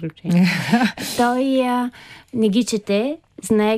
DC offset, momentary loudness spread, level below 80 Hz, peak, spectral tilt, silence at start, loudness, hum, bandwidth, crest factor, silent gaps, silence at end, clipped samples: under 0.1%; 9 LU; -58 dBFS; -4 dBFS; -5.5 dB/octave; 0 s; -19 LUFS; none; 15.5 kHz; 14 dB; none; 0 s; under 0.1%